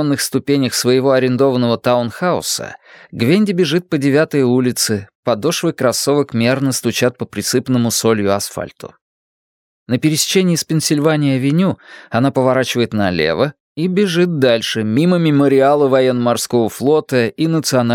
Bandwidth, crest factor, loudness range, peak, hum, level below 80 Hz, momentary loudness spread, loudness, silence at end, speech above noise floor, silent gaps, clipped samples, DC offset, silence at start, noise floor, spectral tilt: 18.5 kHz; 14 dB; 3 LU; 0 dBFS; none; -56 dBFS; 6 LU; -15 LUFS; 0 s; over 75 dB; 5.15-5.23 s, 9.01-9.86 s, 13.60-13.75 s; under 0.1%; under 0.1%; 0 s; under -90 dBFS; -5 dB/octave